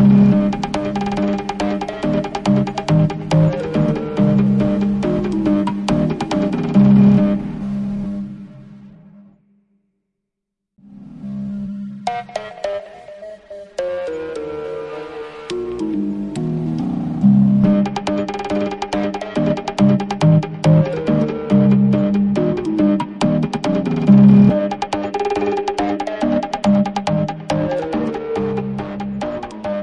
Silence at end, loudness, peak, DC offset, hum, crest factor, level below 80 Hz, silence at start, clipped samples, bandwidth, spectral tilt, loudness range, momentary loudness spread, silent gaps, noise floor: 0 s; -17 LUFS; 0 dBFS; under 0.1%; none; 16 dB; -42 dBFS; 0 s; under 0.1%; 9 kHz; -8 dB/octave; 14 LU; 14 LU; none; -80 dBFS